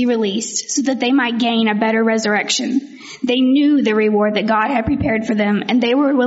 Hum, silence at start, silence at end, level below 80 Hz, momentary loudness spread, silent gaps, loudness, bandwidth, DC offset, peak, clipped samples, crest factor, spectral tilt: none; 0 s; 0 s; -48 dBFS; 5 LU; none; -16 LUFS; 8 kHz; under 0.1%; -4 dBFS; under 0.1%; 12 dB; -3.5 dB/octave